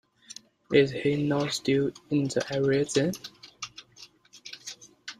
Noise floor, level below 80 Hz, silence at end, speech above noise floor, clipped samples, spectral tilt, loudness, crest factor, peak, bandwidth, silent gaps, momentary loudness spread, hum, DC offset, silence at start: -54 dBFS; -64 dBFS; 0.05 s; 28 dB; under 0.1%; -5 dB/octave; -26 LUFS; 20 dB; -8 dBFS; 13 kHz; none; 22 LU; none; under 0.1%; 0.7 s